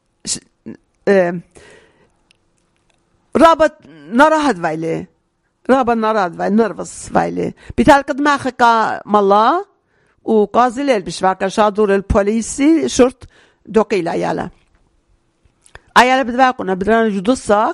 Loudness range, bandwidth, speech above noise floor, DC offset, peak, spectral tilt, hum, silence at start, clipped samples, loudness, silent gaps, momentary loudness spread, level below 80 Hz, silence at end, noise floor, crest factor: 4 LU; 14 kHz; 50 dB; under 0.1%; 0 dBFS; -5 dB/octave; none; 0.25 s; 0.2%; -15 LUFS; none; 12 LU; -40 dBFS; 0 s; -64 dBFS; 16 dB